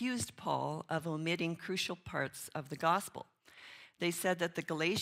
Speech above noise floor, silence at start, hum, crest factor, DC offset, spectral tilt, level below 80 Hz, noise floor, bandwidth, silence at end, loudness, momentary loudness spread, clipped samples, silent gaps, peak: 20 dB; 0 s; none; 20 dB; under 0.1%; -4 dB/octave; -72 dBFS; -57 dBFS; 16 kHz; 0 s; -37 LUFS; 19 LU; under 0.1%; none; -16 dBFS